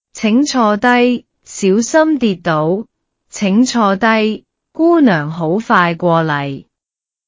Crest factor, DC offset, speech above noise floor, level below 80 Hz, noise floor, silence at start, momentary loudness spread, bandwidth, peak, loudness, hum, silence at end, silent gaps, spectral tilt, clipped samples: 14 dB; under 0.1%; 73 dB; -56 dBFS; -85 dBFS; 0.15 s; 11 LU; 8 kHz; 0 dBFS; -13 LUFS; none; 0.65 s; none; -5.5 dB/octave; under 0.1%